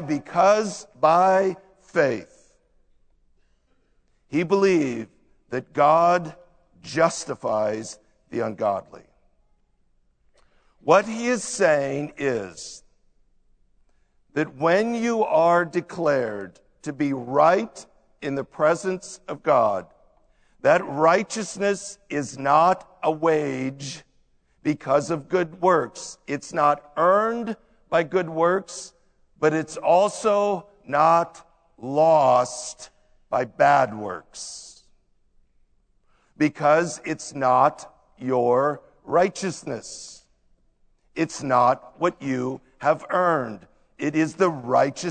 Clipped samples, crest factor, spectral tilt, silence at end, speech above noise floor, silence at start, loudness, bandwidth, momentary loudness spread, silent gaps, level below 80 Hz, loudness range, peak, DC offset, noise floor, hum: under 0.1%; 20 dB; -5 dB/octave; 0 s; 42 dB; 0 s; -22 LUFS; 9.4 kHz; 16 LU; none; -62 dBFS; 5 LU; -2 dBFS; under 0.1%; -64 dBFS; none